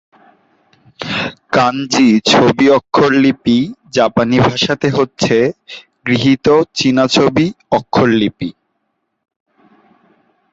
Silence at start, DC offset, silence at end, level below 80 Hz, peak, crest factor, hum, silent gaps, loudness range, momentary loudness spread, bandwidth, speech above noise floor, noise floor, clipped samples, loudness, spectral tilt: 1 s; under 0.1%; 2 s; -48 dBFS; 0 dBFS; 14 dB; none; none; 4 LU; 9 LU; 8 kHz; 57 dB; -69 dBFS; under 0.1%; -13 LUFS; -5 dB/octave